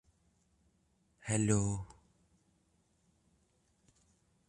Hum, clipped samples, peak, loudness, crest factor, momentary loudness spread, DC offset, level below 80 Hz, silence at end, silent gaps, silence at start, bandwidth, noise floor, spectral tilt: none; under 0.1%; -16 dBFS; -34 LUFS; 24 dB; 19 LU; under 0.1%; -60 dBFS; 2.6 s; none; 1.25 s; 11 kHz; -75 dBFS; -5.5 dB/octave